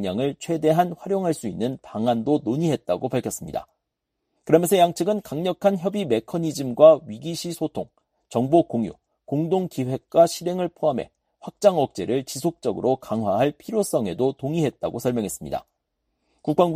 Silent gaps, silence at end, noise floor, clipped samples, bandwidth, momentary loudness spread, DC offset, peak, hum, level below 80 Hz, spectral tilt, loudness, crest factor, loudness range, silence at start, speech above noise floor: none; 0 s; -80 dBFS; under 0.1%; 15.5 kHz; 12 LU; under 0.1%; -2 dBFS; none; -60 dBFS; -6 dB/octave; -23 LUFS; 22 dB; 5 LU; 0 s; 58 dB